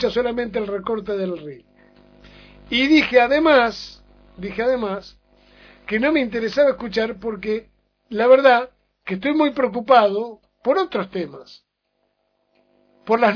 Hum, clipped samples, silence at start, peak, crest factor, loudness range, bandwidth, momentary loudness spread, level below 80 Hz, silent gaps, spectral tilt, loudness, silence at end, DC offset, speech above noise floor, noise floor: 50 Hz at -50 dBFS; under 0.1%; 0 s; -2 dBFS; 20 dB; 5 LU; 5.4 kHz; 18 LU; -52 dBFS; none; -5.5 dB/octave; -19 LUFS; 0 s; under 0.1%; 52 dB; -71 dBFS